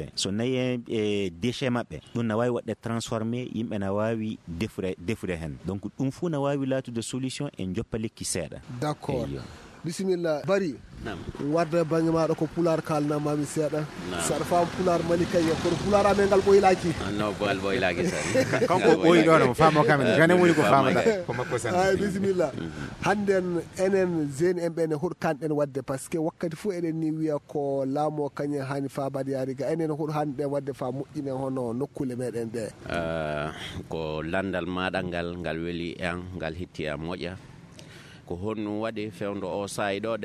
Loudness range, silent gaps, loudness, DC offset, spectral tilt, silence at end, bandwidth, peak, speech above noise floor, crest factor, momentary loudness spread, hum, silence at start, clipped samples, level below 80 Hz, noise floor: 10 LU; none; -27 LUFS; under 0.1%; -5.5 dB/octave; 0 s; 14 kHz; -4 dBFS; 21 dB; 22 dB; 13 LU; none; 0 s; under 0.1%; -50 dBFS; -47 dBFS